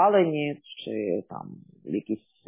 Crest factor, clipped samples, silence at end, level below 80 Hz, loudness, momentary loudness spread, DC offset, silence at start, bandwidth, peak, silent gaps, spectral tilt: 18 dB; under 0.1%; 0.3 s; -72 dBFS; -28 LUFS; 18 LU; under 0.1%; 0 s; 3.8 kHz; -8 dBFS; none; -10.5 dB/octave